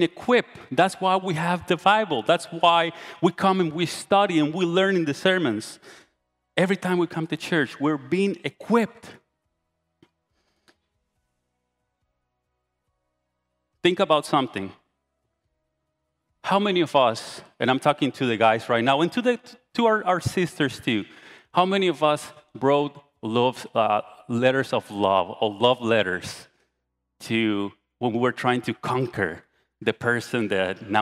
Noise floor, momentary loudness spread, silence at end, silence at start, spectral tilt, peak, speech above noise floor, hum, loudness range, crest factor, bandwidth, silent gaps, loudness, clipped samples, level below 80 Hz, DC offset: -78 dBFS; 10 LU; 0 s; 0 s; -5.5 dB/octave; -4 dBFS; 55 dB; none; 5 LU; 20 dB; 14.5 kHz; none; -23 LUFS; under 0.1%; -66 dBFS; under 0.1%